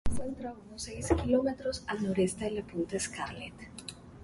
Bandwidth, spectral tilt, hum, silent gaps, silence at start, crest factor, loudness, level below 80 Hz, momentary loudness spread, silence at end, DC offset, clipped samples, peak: 11.5 kHz; -5 dB/octave; none; none; 0.05 s; 20 dB; -33 LUFS; -46 dBFS; 15 LU; 0 s; under 0.1%; under 0.1%; -14 dBFS